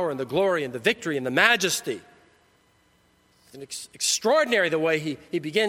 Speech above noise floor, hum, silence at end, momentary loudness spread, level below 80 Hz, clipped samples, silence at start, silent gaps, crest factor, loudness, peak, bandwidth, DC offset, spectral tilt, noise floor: 38 dB; none; 0 s; 17 LU; -68 dBFS; under 0.1%; 0 s; none; 24 dB; -23 LUFS; -2 dBFS; 16.5 kHz; under 0.1%; -2.5 dB/octave; -63 dBFS